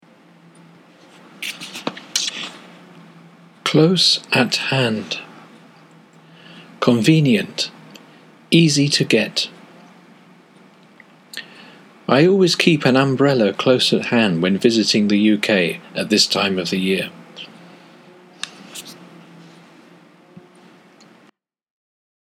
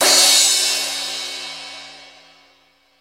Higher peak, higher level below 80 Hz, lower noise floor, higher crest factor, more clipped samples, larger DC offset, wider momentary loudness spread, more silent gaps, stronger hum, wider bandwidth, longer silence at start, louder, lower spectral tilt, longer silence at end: about the same, 0 dBFS vs 0 dBFS; about the same, -72 dBFS vs -68 dBFS; about the same, -56 dBFS vs -57 dBFS; about the same, 20 dB vs 20 dB; neither; neither; second, 18 LU vs 22 LU; neither; neither; about the same, 16 kHz vs 16.5 kHz; first, 1.4 s vs 0 s; second, -17 LUFS vs -14 LUFS; first, -4.5 dB/octave vs 2 dB/octave; first, 3.2 s vs 0.95 s